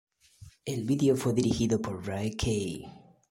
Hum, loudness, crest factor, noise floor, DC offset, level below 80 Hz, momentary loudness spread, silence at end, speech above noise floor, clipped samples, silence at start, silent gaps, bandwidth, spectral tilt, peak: none; -29 LUFS; 18 dB; -54 dBFS; under 0.1%; -50 dBFS; 14 LU; 0.3 s; 25 dB; under 0.1%; 0.4 s; none; 16.5 kHz; -6 dB/octave; -12 dBFS